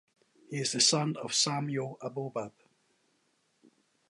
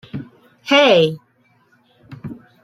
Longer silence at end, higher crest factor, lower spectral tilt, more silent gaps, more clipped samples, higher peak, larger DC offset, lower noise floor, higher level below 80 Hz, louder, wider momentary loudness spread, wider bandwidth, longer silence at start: first, 1.6 s vs 0.3 s; first, 24 dB vs 18 dB; second, -3 dB/octave vs -5 dB/octave; neither; neither; second, -12 dBFS vs -2 dBFS; neither; first, -74 dBFS vs -58 dBFS; second, -80 dBFS vs -60 dBFS; second, -30 LUFS vs -14 LUFS; second, 15 LU vs 24 LU; second, 11.5 kHz vs 14 kHz; first, 0.5 s vs 0.15 s